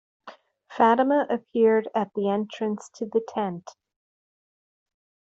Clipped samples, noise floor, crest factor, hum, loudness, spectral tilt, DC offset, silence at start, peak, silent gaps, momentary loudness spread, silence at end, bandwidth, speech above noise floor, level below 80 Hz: under 0.1%; -49 dBFS; 20 dB; none; -24 LUFS; -5 dB/octave; under 0.1%; 0.25 s; -6 dBFS; none; 11 LU; 1.65 s; 8 kHz; 25 dB; -74 dBFS